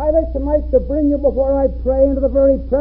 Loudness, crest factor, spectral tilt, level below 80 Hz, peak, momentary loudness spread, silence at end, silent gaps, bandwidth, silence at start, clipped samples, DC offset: -16 LUFS; 12 dB; -14.5 dB/octave; -24 dBFS; -2 dBFS; 3 LU; 0 s; none; 2.1 kHz; 0 s; under 0.1%; under 0.1%